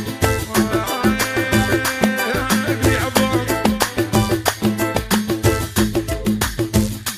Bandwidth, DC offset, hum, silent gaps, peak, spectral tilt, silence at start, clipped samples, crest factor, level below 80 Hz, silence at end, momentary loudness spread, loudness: 15.5 kHz; under 0.1%; none; none; 0 dBFS; -4.5 dB/octave; 0 s; under 0.1%; 18 dB; -32 dBFS; 0 s; 3 LU; -18 LUFS